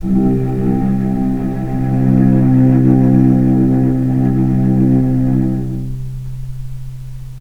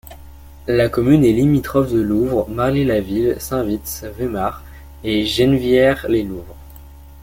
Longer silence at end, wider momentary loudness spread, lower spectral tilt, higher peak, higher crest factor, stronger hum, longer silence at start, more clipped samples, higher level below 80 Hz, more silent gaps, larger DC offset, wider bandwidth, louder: about the same, 0 s vs 0 s; first, 17 LU vs 12 LU; first, -11 dB/octave vs -6.5 dB/octave; about the same, 0 dBFS vs -2 dBFS; about the same, 12 dB vs 16 dB; neither; about the same, 0 s vs 0.05 s; neither; first, -26 dBFS vs -36 dBFS; neither; neither; second, 3 kHz vs 17 kHz; first, -13 LUFS vs -17 LUFS